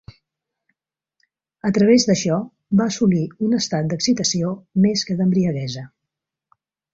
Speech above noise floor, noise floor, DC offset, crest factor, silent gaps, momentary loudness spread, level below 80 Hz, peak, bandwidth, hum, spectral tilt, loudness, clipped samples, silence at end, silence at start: 65 dB; -83 dBFS; under 0.1%; 16 dB; none; 9 LU; -56 dBFS; -4 dBFS; 7.8 kHz; none; -5.5 dB/octave; -19 LUFS; under 0.1%; 1.05 s; 1.65 s